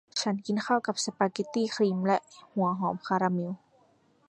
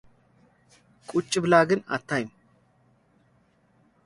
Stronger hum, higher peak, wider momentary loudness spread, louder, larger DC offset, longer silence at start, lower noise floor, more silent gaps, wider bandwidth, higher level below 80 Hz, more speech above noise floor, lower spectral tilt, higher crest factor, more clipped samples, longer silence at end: neither; second, -10 dBFS vs -6 dBFS; second, 5 LU vs 15 LU; second, -29 LUFS vs -24 LUFS; neither; second, 0.15 s vs 1.1 s; about the same, -65 dBFS vs -64 dBFS; neither; about the same, 11.5 kHz vs 11.5 kHz; second, -74 dBFS vs -66 dBFS; second, 36 dB vs 40 dB; about the same, -5 dB/octave vs -5 dB/octave; about the same, 20 dB vs 24 dB; neither; second, 0.7 s vs 1.8 s